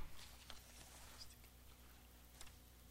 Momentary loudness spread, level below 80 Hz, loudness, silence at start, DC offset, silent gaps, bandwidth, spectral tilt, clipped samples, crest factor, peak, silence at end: 6 LU; -64 dBFS; -60 LUFS; 0 s; under 0.1%; none; 16 kHz; -2.5 dB/octave; under 0.1%; 20 dB; -36 dBFS; 0 s